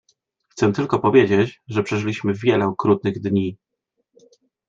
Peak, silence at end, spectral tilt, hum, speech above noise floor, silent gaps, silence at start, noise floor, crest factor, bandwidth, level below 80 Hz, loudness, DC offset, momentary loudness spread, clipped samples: -2 dBFS; 1.15 s; -7 dB/octave; none; 55 dB; none; 0.55 s; -74 dBFS; 18 dB; 7.8 kHz; -60 dBFS; -20 LUFS; under 0.1%; 8 LU; under 0.1%